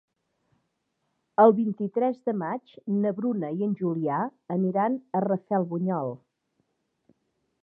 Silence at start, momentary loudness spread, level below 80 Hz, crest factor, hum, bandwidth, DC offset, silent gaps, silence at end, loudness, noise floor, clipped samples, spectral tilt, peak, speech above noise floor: 1.4 s; 11 LU; -82 dBFS; 22 dB; none; 3.8 kHz; under 0.1%; none; 1.45 s; -26 LUFS; -77 dBFS; under 0.1%; -11.5 dB/octave; -4 dBFS; 52 dB